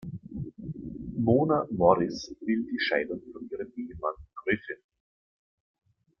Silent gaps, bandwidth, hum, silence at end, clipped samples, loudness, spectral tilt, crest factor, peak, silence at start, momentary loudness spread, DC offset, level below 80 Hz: none; 6.8 kHz; none; 1.45 s; under 0.1%; -29 LUFS; -7 dB/octave; 24 dB; -6 dBFS; 0 s; 16 LU; under 0.1%; -56 dBFS